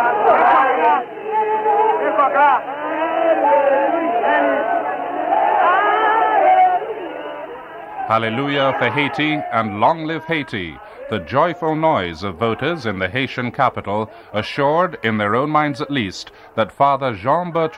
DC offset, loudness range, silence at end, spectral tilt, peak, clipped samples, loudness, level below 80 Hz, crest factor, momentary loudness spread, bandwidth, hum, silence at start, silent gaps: under 0.1%; 4 LU; 0 s; -6.5 dB/octave; -2 dBFS; under 0.1%; -17 LUFS; -56 dBFS; 16 dB; 12 LU; 10.5 kHz; none; 0 s; none